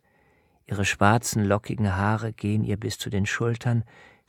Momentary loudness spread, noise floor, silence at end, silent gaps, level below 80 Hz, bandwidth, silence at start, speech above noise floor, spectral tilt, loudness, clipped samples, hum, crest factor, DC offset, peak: 8 LU; -63 dBFS; 0.45 s; none; -54 dBFS; 17.5 kHz; 0.7 s; 38 dB; -5.5 dB/octave; -25 LUFS; under 0.1%; none; 22 dB; under 0.1%; -2 dBFS